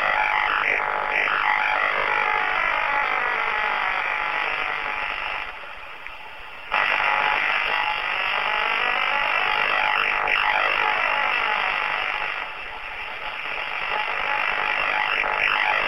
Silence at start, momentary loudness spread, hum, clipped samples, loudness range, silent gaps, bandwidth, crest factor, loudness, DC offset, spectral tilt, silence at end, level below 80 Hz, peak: 0 s; 10 LU; none; under 0.1%; 5 LU; none; 14 kHz; 20 dB; -21 LUFS; 0.8%; -2 dB/octave; 0 s; -52 dBFS; -4 dBFS